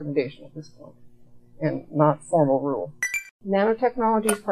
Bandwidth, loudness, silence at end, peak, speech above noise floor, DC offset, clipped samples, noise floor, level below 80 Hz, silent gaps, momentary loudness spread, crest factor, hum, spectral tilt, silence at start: 14 kHz; -24 LUFS; 0 s; -4 dBFS; 24 dB; under 0.1%; under 0.1%; -48 dBFS; -62 dBFS; 3.31-3.40 s; 11 LU; 20 dB; none; -6 dB/octave; 0 s